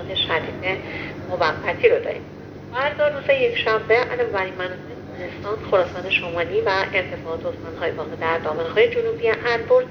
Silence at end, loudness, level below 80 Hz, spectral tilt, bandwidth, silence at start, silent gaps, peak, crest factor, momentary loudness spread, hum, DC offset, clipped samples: 0 s; -22 LUFS; -52 dBFS; -5.5 dB/octave; 6.6 kHz; 0 s; none; -2 dBFS; 20 dB; 12 LU; 50 Hz at -45 dBFS; under 0.1%; under 0.1%